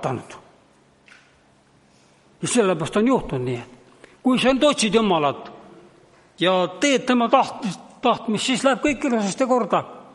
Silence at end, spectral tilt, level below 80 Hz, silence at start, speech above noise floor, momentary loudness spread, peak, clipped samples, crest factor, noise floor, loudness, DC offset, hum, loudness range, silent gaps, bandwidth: 0.15 s; -4 dB/octave; -52 dBFS; 0 s; 36 dB; 13 LU; -2 dBFS; under 0.1%; 20 dB; -57 dBFS; -21 LUFS; under 0.1%; none; 4 LU; none; 11.5 kHz